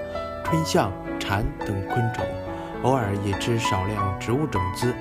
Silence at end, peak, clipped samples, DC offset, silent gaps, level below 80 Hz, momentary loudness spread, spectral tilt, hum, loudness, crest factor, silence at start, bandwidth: 0 s; -6 dBFS; under 0.1%; under 0.1%; none; -42 dBFS; 7 LU; -5.5 dB/octave; none; -25 LUFS; 18 dB; 0 s; 15.5 kHz